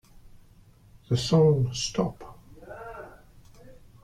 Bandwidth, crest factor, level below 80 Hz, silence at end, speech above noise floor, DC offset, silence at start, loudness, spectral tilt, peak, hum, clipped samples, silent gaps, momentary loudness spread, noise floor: 12.5 kHz; 20 dB; -52 dBFS; 0.3 s; 32 dB; under 0.1%; 0.25 s; -25 LUFS; -6 dB/octave; -10 dBFS; none; under 0.1%; none; 26 LU; -55 dBFS